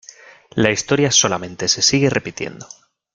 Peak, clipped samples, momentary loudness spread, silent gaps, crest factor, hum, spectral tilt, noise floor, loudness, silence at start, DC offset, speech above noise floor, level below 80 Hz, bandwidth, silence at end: 0 dBFS; under 0.1%; 15 LU; none; 20 dB; none; -3 dB/octave; -43 dBFS; -16 LUFS; 0.55 s; under 0.1%; 25 dB; -52 dBFS; 11 kHz; 0.5 s